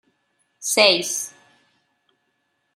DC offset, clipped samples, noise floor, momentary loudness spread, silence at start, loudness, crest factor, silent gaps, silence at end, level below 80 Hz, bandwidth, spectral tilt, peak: under 0.1%; under 0.1%; -72 dBFS; 16 LU; 0.6 s; -18 LUFS; 24 dB; none; 1.45 s; -76 dBFS; 16 kHz; -0.5 dB/octave; -2 dBFS